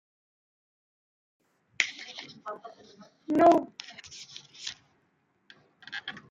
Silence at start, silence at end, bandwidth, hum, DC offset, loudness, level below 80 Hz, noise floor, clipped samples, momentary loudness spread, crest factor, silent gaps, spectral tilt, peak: 1.8 s; 0.1 s; 9.2 kHz; none; under 0.1%; -27 LUFS; -74 dBFS; -72 dBFS; under 0.1%; 23 LU; 26 dB; none; -3.5 dB/octave; -6 dBFS